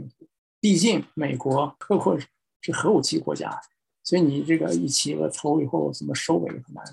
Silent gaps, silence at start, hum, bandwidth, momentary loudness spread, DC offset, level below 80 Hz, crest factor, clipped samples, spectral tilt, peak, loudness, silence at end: 0.38-0.62 s, 2.56-2.60 s; 0 s; none; 12.5 kHz; 12 LU; under 0.1%; -70 dBFS; 16 dB; under 0.1%; -4.5 dB/octave; -8 dBFS; -24 LUFS; 0 s